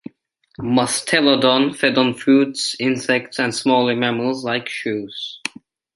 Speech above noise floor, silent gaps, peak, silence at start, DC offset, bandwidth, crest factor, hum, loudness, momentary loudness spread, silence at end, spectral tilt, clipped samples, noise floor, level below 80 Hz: 38 dB; none; -2 dBFS; 0.6 s; under 0.1%; 11.5 kHz; 18 dB; none; -18 LUFS; 12 LU; 0.5 s; -4 dB/octave; under 0.1%; -56 dBFS; -62 dBFS